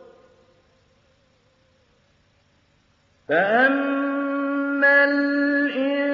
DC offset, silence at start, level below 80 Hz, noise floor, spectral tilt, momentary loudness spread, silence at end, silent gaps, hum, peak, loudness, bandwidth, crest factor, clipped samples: under 0.1%; 0 s; -74 dBFS; -62 dBFS; -6.5 dB/octave; 8 LU; 0 s; none; none; -6 dBFS; -20 LUFS; 5.6 kHz; 16 dB; under 0.1%